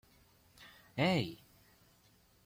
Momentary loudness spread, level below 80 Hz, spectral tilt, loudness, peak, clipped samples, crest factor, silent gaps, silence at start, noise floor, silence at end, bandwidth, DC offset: 25 LU; -70 dBFS; -6 dB/octave; -35 LUFS; -20 dBFS; under 0.1%; 20 dB; none; 0.6 s; -68 dBFS; 1.1 s; 16.5 kHz; under 0.1%